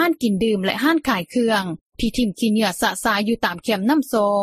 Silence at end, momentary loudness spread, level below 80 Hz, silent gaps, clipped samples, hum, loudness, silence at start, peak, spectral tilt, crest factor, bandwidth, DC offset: 0 s; 4 LU; -44 dBFS; 1.81-1.90 s; under 0.1%; none; -20 LUFS; 0 s; -4 dBFS; -4.5 dB/octave; 16 dB; 15.5 kHz; under 0.1%